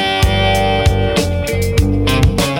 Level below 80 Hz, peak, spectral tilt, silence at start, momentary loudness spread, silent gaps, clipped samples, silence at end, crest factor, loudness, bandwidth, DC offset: -20 dBFS; -2 dBFS; -5 dB/octave; 0 s; 3 LU; none; under 0.1%; 0 s; 12 dB; -14 LUFS; 16.5 kHz; under 0.1%